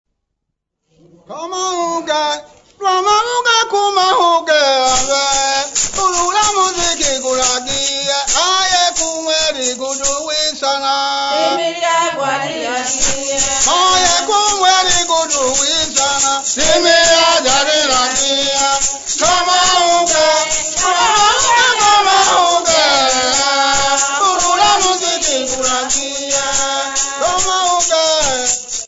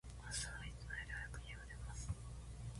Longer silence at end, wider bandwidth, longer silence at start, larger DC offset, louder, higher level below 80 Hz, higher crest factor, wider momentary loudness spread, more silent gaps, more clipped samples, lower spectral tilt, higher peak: about the same, 0 s vs 0 s; second, 8 kHz vs 11.5 kHz; first, 1.3 s vs 0.05 s; neither; first, -12 LUFS vs -49 LUFS; first, -40 dBFS vs -52 dBFS; second, 14 dB vs 20 dB; about the same, 6 LU vs 7 LU; neither; neither; second, 0 dB/octave vs -3 dB/octave; first, 0 dBFS vs -28 dBFS